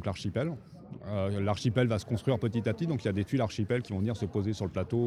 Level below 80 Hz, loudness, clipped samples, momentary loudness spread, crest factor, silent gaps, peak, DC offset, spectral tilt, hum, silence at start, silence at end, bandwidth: -56 dBFS; -31 LUFS; under 0.1%; 6 LU; 16 dB; none; -14 dBFS; under 0.1%; -7 dB/octave; none; 0 s; 0 s; 11.5 kHz